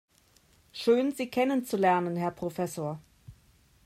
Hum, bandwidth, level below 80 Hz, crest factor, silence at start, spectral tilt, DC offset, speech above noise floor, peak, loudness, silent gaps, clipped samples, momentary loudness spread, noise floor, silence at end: none; 16 kHz; -66 dBFS; 18 dB; 0.75 s; -6 dB/octave; under 0.1%; 36 dB; -12 dBFS; -29 LUFS; none; under 0.1%; 11 LU; -64 dBFS; 0.55 s